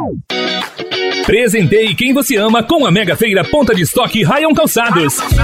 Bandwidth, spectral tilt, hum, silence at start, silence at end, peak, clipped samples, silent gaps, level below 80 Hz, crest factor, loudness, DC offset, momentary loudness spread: 16.5 kHz; -4.5 dB/octave; none; 0 s; 0 s; 0 dBFS; under 0.1%; none; -28 dBFS; 12 dB; -12 LUFS; 0.3%; 7 LU